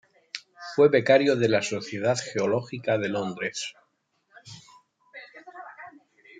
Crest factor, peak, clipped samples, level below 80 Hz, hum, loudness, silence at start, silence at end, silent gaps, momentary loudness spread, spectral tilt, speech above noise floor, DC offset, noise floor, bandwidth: 20 dB; -6 dBFS; under 0.1%; -74 dBFS; none; -24 LUFS; 0.35 s; 0.5 s; none; 25 LU; -5 dB/octave; 47 dB; under 0.1%; -71 dBFS; 9.4 kHz